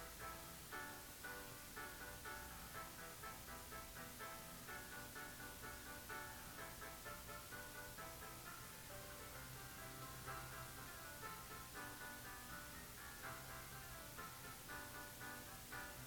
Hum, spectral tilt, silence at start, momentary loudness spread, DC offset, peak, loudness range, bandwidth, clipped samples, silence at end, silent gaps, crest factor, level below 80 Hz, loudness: none; -2.5 dB/octave; 0 s; 2 LU; under 0.1%; -38 dBFS; 1 LU; 19.5 kHz; under 0.1%; 0 s; none; 16 dB; -66 dBFS; -52 LUFS